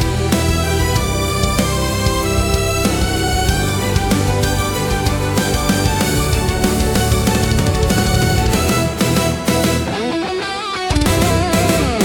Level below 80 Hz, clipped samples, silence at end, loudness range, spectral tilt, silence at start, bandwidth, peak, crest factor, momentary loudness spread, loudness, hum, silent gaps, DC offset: -24 dBFS; under 0.1%; 0 s; 1 LU; -4.5 dB/octave; 0 s; 18 kHz; 0 dBFS; 14 dB; 3 LU; -16 LUFS; none; none; under 0.1%